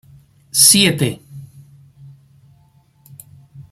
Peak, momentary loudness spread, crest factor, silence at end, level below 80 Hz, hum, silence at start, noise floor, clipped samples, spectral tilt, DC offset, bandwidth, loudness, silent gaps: 0 dBFS; 15 LU; 20 dB; 0.1 s; -56 dBFS; none; 0.55 s; -53 dBFS; under 0.1%; -2 dB/octave; under 0.1%; 16.5 kHz; -12 LUFS; none